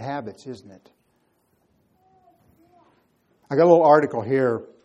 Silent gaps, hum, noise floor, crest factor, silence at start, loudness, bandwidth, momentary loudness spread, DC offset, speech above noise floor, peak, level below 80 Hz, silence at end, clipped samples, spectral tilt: none; none; -67 dBFS; 20 dB; 0 s; -19 LUFS; 7.8 kHz; 25 LU; under 0.1%; 47 dB; -2 dBFS; -70 dBFS; 0.2 s; under 0.1%; -8 dB/octave